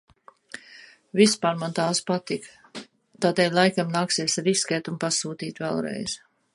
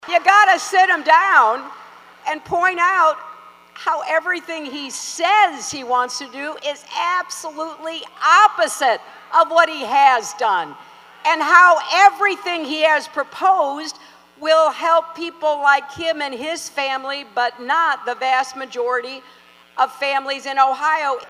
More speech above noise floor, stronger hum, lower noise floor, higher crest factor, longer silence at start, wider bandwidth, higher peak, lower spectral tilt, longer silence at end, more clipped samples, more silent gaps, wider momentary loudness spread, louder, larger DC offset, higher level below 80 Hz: about the same, 26 dB vs 24 dB; neither; first, -50 dBFS vs -41 dBFS; about the same, 20 dB vs 18 dB; first, 0.55 s vs 0.05 s; second, 11.5 kHz vs 15.5 kHz; second, -4 dBFS vs 0 dBFS; first, -3.5 dB/octave vs -1 dB/octave; first, 0.4 s vs 0 s; neither; neither; first, 21 LU vs 15 LU; second, -24 LUFS vs -17 LUFS; neither; about the same, -68 dBFS vs -68 dBFS